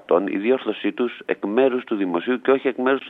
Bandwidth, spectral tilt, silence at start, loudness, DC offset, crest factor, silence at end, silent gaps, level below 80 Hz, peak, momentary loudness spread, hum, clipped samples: 4 kHz; -8 dB/octave; 0.1 s; -22 LUFS; under 0.1%; 16 dB; 0 s; none; -76 dBFS; -4 dBFS; 5 LU; none; under 0.1%